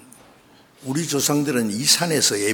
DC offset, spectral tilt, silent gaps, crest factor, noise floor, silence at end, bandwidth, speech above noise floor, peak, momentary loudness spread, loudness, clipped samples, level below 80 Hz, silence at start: under 0.1%; -2.5 dB/octave; none; 20 dB; -52 dBFS; 0 s; 20 kHz; 31 dB; -2 dBFS; 11 LU; -19 LUFS; under 0.1%; -66 dBFS; 0.8 s